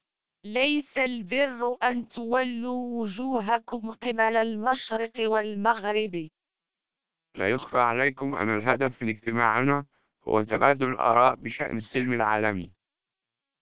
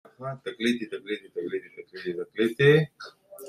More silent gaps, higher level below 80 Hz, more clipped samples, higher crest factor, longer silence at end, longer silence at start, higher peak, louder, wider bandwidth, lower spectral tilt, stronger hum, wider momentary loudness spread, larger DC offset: neither; first, -62 dBFS vs -68 dBFS; neither; about the same, 24 dB vs 20 dB; first, 0.95 s vs 0 s; first, 0.45 s vs 0.2 s; first, -4 dBFS vs -8 dBFS; about the same, -26 LUFS vs -27 LUFS; second, 4 kHz vs 15 kHz; first, -9 dB/octave vs -6.5 dB/octave; neither; second, 9 LU vs 18 LU; first, 0.2% vs under 0.1%